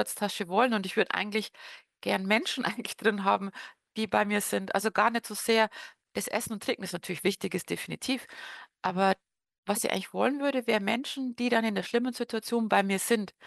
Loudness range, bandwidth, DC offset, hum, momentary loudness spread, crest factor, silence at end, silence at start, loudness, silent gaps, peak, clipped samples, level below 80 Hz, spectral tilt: 3 LU; 13 kHz; under 0.1%; none; 10 LU; 20 dB; 0 s; 0 s; -29 LUFS; 9.58-9.63 s; -10 dBFS; under 0.1%; -74 dBFS; -3.5 dB/octave